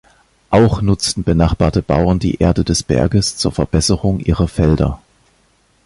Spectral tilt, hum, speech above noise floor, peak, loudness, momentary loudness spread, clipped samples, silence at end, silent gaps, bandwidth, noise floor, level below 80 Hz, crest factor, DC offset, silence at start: -6 dB/octave; none; 42 dB; 0 dBFS; -15 LUFS; 4 LU; under 0.1%; 0.9 s; none; 11.5 kHz; -56 dBFS; -26 dBFS; 14 dB; under 0.1%; 0.5 s